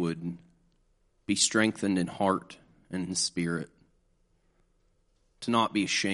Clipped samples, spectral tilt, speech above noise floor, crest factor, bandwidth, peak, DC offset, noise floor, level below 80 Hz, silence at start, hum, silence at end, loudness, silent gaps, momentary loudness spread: under 0.1%; -3.5 dB/octave; 40 dB; 22 dB; 11.5 kHz; -10 dBFS; under 0.1%; -69 dBFS; -66 dBFS; 0 s; none; 0 s; -29 LUFS; none; 15 LU